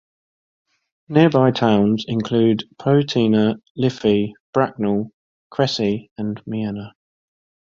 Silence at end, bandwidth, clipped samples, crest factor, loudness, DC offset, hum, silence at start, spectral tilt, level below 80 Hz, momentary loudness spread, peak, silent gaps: 0.85 s; 7.4 kHz; under 0.1%; 18 dB; -19 LUFS; under 0.1%; none; 1.1 s; -7 dB/octave; -56 dBFS; 12 LU; -2 dBFS; 3.70-3.75 s, 4.40-4.53 s, 5.14-5.50 s, 6.11-6.16 s